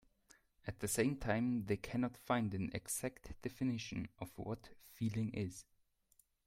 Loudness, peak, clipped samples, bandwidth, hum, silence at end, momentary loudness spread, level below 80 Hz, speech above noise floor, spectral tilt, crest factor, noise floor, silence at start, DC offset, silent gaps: -41 LUFS; -20 dBFS; under 0.1%; 16 kHz; none; 0.85 s; 12 LU; -62 dBFS; 35 dB; -5.5 dB/octave; 22 dB; -75 dBFS; 0.65 s; under 0.1%; none